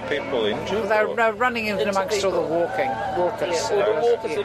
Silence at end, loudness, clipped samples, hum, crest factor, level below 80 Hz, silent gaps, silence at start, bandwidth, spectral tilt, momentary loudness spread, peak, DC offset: 0 s; -22 LUFS; under 0.1%; none; 16 dB; -52 dBFS; none; 0 s; 14 kHz; -4 dB/octave; 4 LU; -6 dBFS; under 0.1%